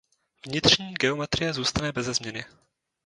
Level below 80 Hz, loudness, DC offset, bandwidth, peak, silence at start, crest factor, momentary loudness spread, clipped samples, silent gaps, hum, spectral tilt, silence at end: -50 dBFS; -24 LUFS; under 0.1%; 11 kHz; -4 dBFS; 0.45 s; 24 dB; 12 LU; under 0.1%; none; none; -3 dB/octave; 0.6 s